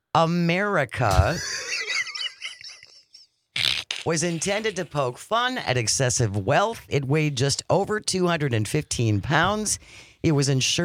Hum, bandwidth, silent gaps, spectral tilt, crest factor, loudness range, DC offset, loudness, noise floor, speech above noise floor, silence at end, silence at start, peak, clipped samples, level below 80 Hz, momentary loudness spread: none; 16 kHz; none; -4 dB/octave; 22 dB; 4 LU; under 0.1%; -23 LUFS; -55 dBFS; 32 dB; 0 s; 0.15 s; -2 dBFS; under 0.1%; -42 dBFS; 7 LU